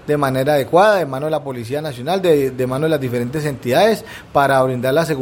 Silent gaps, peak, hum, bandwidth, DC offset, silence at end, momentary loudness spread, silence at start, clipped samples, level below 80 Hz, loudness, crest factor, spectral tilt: none; 0 dBFS; none; 17 kHz; under 0.1%; 0 s; 10 LU; 0.05 s; under 0.1%; -50 dBFS; -17 LUFS; 16 dB; -6 dB/octave